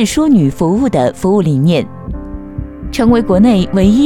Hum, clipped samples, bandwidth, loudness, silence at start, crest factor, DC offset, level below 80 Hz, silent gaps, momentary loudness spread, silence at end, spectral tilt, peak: none; under 0.1%; 16.5 kHz; -12 LUFS; 0 s; 12 dB; under 0.1%; -30 dBFS; none; 16 LU; 0 s; -7 dB/octave; 0 dBFS